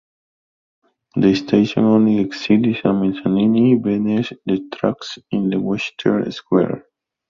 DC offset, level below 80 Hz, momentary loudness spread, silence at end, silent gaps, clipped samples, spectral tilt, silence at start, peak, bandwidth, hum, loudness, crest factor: under 0.1%; -54 dBFS; 8 LU; 0.5 s; none; under 0.1%; -7.5 dB/octave; 1.15 s; -2 dBFS; 7.2 kHz; none; -18 LUFS; 16 dB